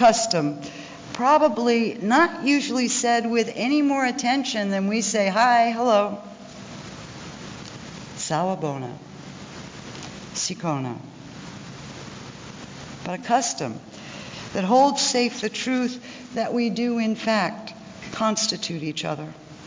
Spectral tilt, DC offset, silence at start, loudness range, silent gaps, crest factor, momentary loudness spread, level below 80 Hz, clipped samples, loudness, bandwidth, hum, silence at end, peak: -3.5 dB/octave; under 0.1%; 0 s; 11 LU; none; 18 dB; 20 LU; -60 dBFS; under 0.1%; -22 LUFS; 7.8 kHz; none; 0 s; -6 dBFS